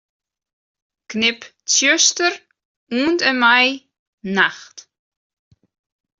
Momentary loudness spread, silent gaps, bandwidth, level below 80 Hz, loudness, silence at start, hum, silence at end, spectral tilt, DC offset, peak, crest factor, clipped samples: 19 LU; 2.65-2.87 s, 3.99-4.18 s; 7.8 kHz; -66 dBFS; -16 LUFS; 1.1 s; none; 1.4 s; -1 dB/octave; under 0.1%; -2 dBFS; 18 dB; under 0.1%